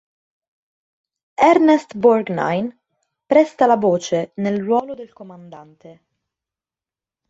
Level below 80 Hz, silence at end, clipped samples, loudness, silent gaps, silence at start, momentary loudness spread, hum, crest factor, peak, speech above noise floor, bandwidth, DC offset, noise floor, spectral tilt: -64 dBFS; 1.4 s; under 0.1%; -17 LUFS; none; 1.4 s; 20 LU; none; 18 dB; -2 dBFS; over 73 dB; 8 kHz; under 0.1%; under -90 dBFS; -6 dB/octave